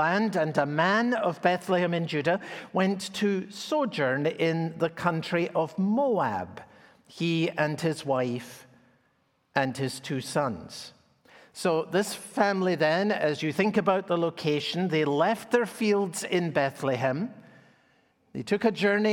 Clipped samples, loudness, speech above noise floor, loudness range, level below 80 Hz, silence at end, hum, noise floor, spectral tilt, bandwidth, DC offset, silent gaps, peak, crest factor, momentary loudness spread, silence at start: under 0.1%; -27 LUFS; 43 dB; 5 LU; -72 dBFS; 0 s; none; -70 dBFS; -5.5 dB/octave; 17.5 kHz; under 0.1%; none; -6 dBFS; 20 dB; 8 LU; 0 s